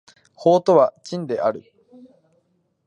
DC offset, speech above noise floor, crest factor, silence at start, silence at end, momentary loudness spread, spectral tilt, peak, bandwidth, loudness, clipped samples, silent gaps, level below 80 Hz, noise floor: under 0.1%; 48 dB; 20 dB; 0.4 s; 1.25 s; 14 LU; -7 dB/octave; -2 dBFS; 9.8 kHz; -19 LUFS; under 0.1%; none; -72 dBFS; -67 dBFS